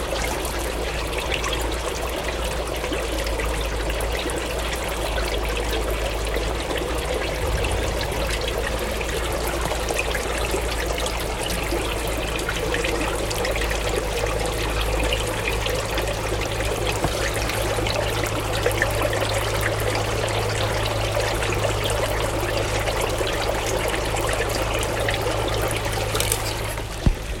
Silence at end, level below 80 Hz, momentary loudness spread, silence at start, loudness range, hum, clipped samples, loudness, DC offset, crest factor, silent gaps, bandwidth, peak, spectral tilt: 0 s; -30 dBFS; 3 LU; 0 s; 2 LU; none; under 0.1%; -24 LUFS; under 0.1%; 24 dB; none; 17 kHz; 0 dBFS; -4 dB/octave